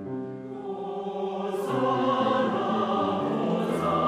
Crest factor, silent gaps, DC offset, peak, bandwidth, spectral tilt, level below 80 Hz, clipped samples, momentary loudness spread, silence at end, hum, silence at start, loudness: 16 dB; none; under 0.1%; -12 dBFS; 15 kHz; -7 dB/octave; -64 dBFS; under 0.1%; 11 LU; 0 s; none; 0 s; -27 LUFS